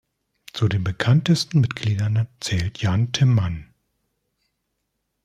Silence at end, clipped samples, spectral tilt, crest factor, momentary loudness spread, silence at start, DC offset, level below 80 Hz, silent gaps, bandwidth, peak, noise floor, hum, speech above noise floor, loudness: 1.6 s; under 0.1%; -6 dB/octave; 18 dB; 7 LU; 0.55 s; under 0.1%; -50 dBFS; none; 12.5 kHz; -4 dBFS; -76 dBFS; none; 56 dB; -21 LUFS